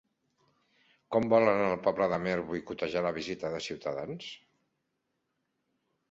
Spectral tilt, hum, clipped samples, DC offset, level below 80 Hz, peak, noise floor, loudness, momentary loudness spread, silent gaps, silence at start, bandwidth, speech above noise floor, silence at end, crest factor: -6 dB/octave; none; under 0.1%; under 0.1%; -64 dBFS; -12 dBFS; -81 dBFS; -30 LUFS; 14 LU; none; 1.1 s; 7.8 kHz; 51 dB; 1.75 s; 22 dB